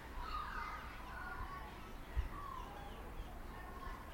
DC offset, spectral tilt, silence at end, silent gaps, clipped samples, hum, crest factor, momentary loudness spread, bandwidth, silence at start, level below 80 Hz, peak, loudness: under 0.1%; -5 dB/octave; 0 s; none; under 0.1%; none; 20 dB; 7 LU; 16.5 kHz; 0 s; -50 dBFS; -26 dBFS; -48 LUFS